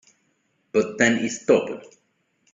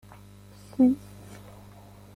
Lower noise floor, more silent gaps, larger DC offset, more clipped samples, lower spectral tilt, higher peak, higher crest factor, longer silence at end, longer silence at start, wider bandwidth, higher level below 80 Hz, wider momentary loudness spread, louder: first, -69 dBFS vs -49 dBFS; neither; neither; neither; second, -4 dB/octave vs -7.5 dB/octave; first, -2 dBFS vs -12 dBFS; about the same, 22 dB vs 18 dB; second, 0.7 s vs 1.2 s; about the same, 0.75 s vs 0.8 s; second, 7.8 kHz vs 13.5 kHz; second, -66 dBFS vs -58 dBFS; second, 11 LU vs 26 LU; first, -22 LUFS vs -25 LUFS